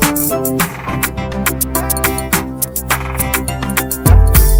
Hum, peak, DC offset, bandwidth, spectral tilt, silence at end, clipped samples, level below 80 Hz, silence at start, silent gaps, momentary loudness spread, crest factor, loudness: none; 0 dBFS; under 0.1%; over 20 kHz; -4.5 dB/octave; 0 s; under 0.1%; -18 dBFS; 0 s; none; 7 LU; 14 dB; -15 LUFS